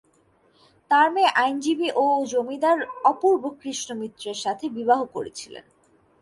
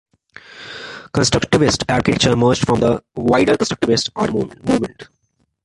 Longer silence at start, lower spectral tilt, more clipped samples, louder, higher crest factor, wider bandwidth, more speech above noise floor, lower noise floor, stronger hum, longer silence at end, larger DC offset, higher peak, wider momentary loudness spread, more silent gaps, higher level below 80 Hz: first, 0.9 s vs 0.55 s; second, -2.5 dB/octave vs -5 dB/octave; neither; second, -23 LUFS vs -17 LUFS; about the same, 18 dB vs 16 dB; about the same, 11.5 kHz vs 11.5 kHz; second, 39 dB vs 50 dB; second, -62 dBFS vs -66 dBFS; neither; about the same, 0.6 s vs 0.6 s; neither; second, -6 dBFS vs -2 dBFS; about the same, 13 LU vs 15 LU; neither; second, -72 dBFS vs -42 dBFS